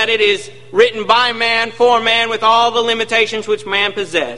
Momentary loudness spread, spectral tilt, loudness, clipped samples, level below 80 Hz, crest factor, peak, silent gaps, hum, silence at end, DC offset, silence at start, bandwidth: 5 LU; -2.5 dB/octave; -14 LUFS; under 0.1%; -56 dBFS; 14 dB; 0 dBFS; none; none; 0 s; 1%; 0 s; 11.5 kHz